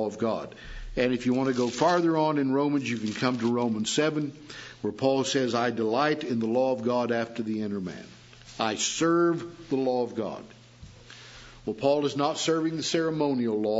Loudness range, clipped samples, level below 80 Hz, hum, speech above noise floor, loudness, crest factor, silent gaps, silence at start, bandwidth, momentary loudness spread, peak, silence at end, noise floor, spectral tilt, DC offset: 3 LU; under 0.1%; -54 dBFS; none; 23 dB; -27 LUFS; 18 dB; none; 0 s; 8 kHz; 14 LU; -8 dBFS; 0 s; -49 dBFS; -4.5 dB/octave; under 0.1%